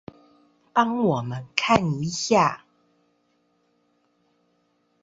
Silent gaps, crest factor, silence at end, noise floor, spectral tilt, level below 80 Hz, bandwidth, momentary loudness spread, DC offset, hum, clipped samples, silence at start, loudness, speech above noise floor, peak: none; 24 dB; 2.45 s; -68 dBFS; -5 dB/octave; -58 dBFS; 8 kHz; 7 LU; under 0.1%; none; under 0.1%; 0.75 s; -23 LUFS; 46 dB; -2 dBFS